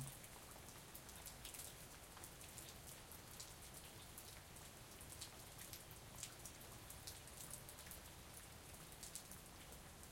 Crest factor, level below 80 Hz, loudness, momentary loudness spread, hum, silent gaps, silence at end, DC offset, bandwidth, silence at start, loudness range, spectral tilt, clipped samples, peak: 28 dB; -68 dBFS; -55 LUFS; 4 LU; none; none; 0 s; under 0.1%; 16.5 kHz; 0 s; 1 LU; -2.5 dB/octave; under 0.1%; -28 dBFS